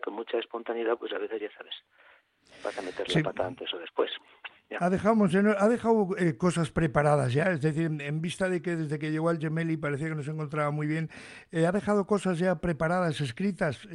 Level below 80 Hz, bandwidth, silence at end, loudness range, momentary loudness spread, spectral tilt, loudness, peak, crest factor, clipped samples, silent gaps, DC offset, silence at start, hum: -56 dBFS; 11.5 kHz; 0 s; 8 LU; 12 LU; -6.5 dB/octave; -29 LUFS; -10 dBFS; 18 dB; under 0.1%; none; under 0.1%; 0 s; none